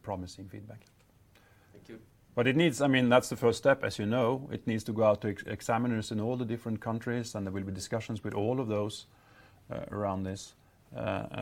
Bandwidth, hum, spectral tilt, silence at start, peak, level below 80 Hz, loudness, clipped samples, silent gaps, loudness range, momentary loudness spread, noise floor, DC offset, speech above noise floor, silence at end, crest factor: 16.5 kHz; none; -6 dB/octave; 0.05 s; -8 dBFS; -64 dBFS; -31 LUFS; under 0.1%; none; 8 LU; 18 LU; -62 dBFS; under 0.1%; 31 dB; 0 s; 24 dB